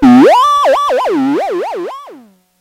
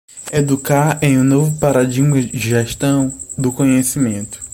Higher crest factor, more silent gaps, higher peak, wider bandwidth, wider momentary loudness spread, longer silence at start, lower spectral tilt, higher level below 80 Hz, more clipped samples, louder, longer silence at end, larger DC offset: about the same, 10 dB vs 14 dB; neither; about the same, 0 dBFS vs -2 dBFS; second, 15 kHz vs 17 kHz; first, 17 LU vs 7 LU; second, 0 s vs 0.15 s; about the same, -5 dB/octave vs -6 dB/octave; about the same, -44 dBFS vs -44 dBFS; neither; first, -10 LUFS vs -15 LUFS; first, 0.45 s vs 0 s; neither